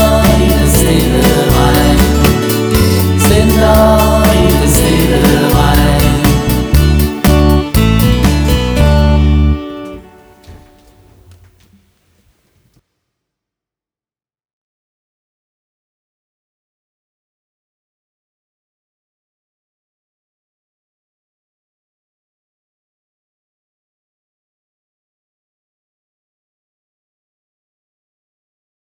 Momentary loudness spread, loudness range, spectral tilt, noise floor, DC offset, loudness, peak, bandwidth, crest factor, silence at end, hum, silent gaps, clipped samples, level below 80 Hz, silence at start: 4 LU; 6 LU; -5.5 dB/octave; under -90 dBFS; under 0.1%; -10 LUFS; 0 dBFS; over 20 kHz; 14 dB; 18.4 s; none; none; under 0.1%; -18 dBFS; 0 s